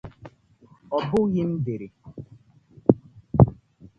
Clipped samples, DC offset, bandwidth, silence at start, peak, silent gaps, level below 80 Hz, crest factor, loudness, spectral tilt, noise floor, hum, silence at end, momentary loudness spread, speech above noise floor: under 0.1%; under 0.1%; 6.2 kHz; 0.05 s; 0 dBFS; none; -42 dBFS; 24 dB; -24 LUFS; -10 dB/octave; -56 dBFS; none; 0.45 s; 24 LU; 32 dB